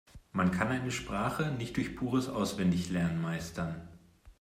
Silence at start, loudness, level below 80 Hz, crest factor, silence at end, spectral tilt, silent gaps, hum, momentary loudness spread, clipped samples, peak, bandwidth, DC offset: 0.15 s; -33 LUFS; -56 dBFS; 18 dB; 0.1 s; -6 dB/octave; none; none; 8 LU; under 0.1%; -14 dBFS; 15.5 kHz; under 0.1%